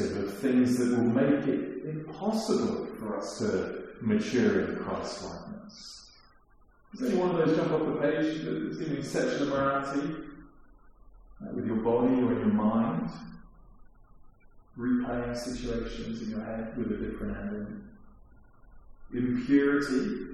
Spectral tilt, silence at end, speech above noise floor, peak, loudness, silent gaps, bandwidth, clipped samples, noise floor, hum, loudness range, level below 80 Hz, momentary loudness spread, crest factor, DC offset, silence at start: -6.5 dB/octave; 0 s; 31 dB; -12 dBFS; -30 LUFS; none; 13.5 kHz; under 0.1%; -60 dBFS; none; 7 LU; -52 dBFS; 14 LU; 18 dB; under 0.1%; 0 s